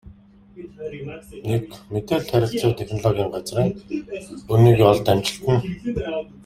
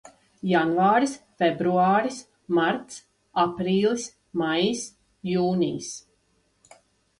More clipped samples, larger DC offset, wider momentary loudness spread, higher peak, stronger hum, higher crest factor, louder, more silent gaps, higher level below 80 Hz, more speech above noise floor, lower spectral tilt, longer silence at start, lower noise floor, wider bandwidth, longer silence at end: neither; neither; first, 19 LU vs 16 LU; first, -2 dBFS vs -8 dBFS; neither; about the same, 20 dB vs 16 dB; first, -21 LUFS vs -24 LUFS; neither; first, -46 dBFS vs -64 dBFS; second, 26 dB vs 45 dB; first, -7 dB/octave vs -5 dB/octave; about the same, 0.05 s vs 0.05 s; second, -47 dBFS vs -68 dBFS; first, 15.5 kHz vs 11.5 kHz; second, 0.05 s vs 1.2 s